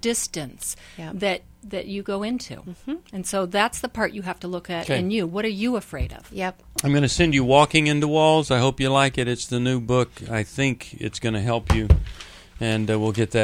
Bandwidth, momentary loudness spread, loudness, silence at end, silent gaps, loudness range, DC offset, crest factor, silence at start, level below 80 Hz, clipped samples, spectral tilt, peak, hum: 16.5 kHz; 14 LU; -23 LUFS; 0 s; none; 8 LU; under 0.1%; 22 dB; 0.05 s; -34 dBFS; under 0.1%; -5 dB/octave; 0 dBFS; none